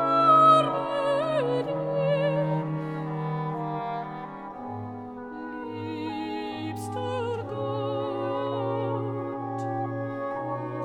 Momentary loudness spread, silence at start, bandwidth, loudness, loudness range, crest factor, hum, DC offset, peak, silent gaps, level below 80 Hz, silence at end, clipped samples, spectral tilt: 15 LU; 0 s; 13 kHz; -27 LUFS; 10 LU; 20 dB; none; under 0.1%; -8 dBFS; none; -66 dBFS; 0 s; under 0.1%; -7.5 dB/octave